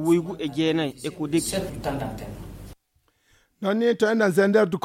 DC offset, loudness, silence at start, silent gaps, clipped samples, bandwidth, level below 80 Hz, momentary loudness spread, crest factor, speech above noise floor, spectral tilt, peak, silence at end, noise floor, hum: under 0.1%; -24 LUFS; 0 s; none; under 0.1%; 16.5 kHz; -48 dBFS; 18 LU; 18 dB; 45 dB; -5.5 dB/octave; -6 dBFS; 0.05 s; -68 dBFS; none